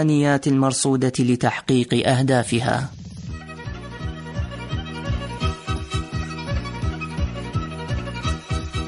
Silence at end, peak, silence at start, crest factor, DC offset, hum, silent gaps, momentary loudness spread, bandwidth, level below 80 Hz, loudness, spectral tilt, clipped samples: 0 s; -4 dBFS; 0 s; 18 dB; under 0.1%; none; none; 14 LU; 11 kHz; -34 dBFS; -23 LUFS; -5.5 dB/octave; under 0.1%